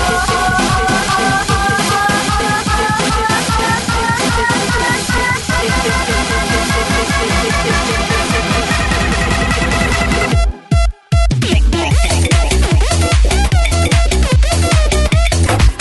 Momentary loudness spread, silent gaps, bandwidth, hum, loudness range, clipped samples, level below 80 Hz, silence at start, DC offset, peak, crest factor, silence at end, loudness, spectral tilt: 2 LU; none; 12 kHz; none; 1 LU; under 0.1%; -18 dBFS; 0 s; under 0.1%; 0 dBFS; 12 dB; 0 s; -13 LUFS; -4 dB/octave